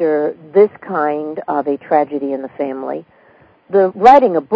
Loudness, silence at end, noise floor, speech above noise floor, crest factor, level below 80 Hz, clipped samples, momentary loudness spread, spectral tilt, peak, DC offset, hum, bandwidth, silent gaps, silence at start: -15 LUFS; 0 s; -49 dBFS; 35 dB; 14 dB; -58 dBFS; 0.4%; 15 LU; -7.5 dB/octave; 0 dBFS; under 0.1%; none; 8 kHz; none; 0 s